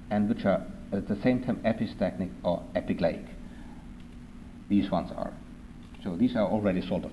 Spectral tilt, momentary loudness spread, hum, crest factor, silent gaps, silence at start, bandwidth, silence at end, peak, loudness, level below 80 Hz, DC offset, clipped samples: -8.5 dB/octave; 20 LU; none; 18 dB; none; 0 s; 11 kHz; 0 s; -12 dBFS; -30 LUFS; -48 dBFS; under 0.1%; under 0.1%